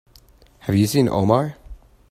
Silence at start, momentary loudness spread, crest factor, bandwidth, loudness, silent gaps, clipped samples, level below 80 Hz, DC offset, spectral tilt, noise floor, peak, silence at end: 0.65 s; 12 LU; 20 dB; 16 kHz; -19 LUFS; none; under 0.1%; -46 dBFS; under 0.1%; -6.5 dB/octave; -51 dBFS; -2 dBFS; 0.35 s